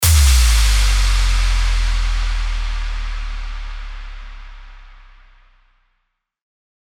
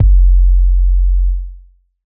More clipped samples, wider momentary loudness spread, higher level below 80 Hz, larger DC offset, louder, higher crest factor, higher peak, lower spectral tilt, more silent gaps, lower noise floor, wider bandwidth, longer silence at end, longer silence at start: neither; first, 22 LU vs 12 LU; second, -18 dBFS vs -10 dBFS; neither; second, -18 LUFS vs -15 LUFS; first, 14 dB vs 8 dB; about the same, -2 dBFS vs -2 dBFS; second, -2 dB/octave vs -19 dB/octave; neither; first, -71 dBFS vs -41 dBFS; first, 19 kHz vs 0.3 kHz; first, 2 s vs 0.6 s; about the same, 0 s vs 0 s